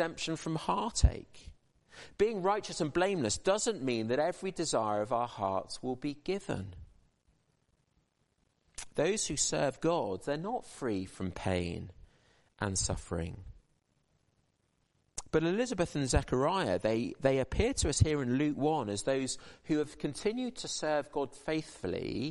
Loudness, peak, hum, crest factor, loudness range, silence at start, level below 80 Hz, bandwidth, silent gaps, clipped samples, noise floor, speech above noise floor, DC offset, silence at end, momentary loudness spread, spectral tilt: -33 LUFS; -12 dBFS; none; 22 dB; 8 LU; 0 s; -46 dBFS; 11.5 kHz; none; under 0.1%; -76 dBFS; 43 dB; under 0.1%; 0 s; 9 LU; -4.5 dB/octave